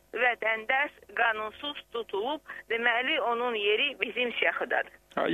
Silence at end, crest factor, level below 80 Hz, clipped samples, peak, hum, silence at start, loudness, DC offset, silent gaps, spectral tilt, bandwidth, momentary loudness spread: 0 s; 20 dB; -68 dBFS; under 0.1%; -8 dBFS; none; 0.15 s; -29 LUFS; under 0.1%; none; -4 dB/octave; 13 kHz; 10 LU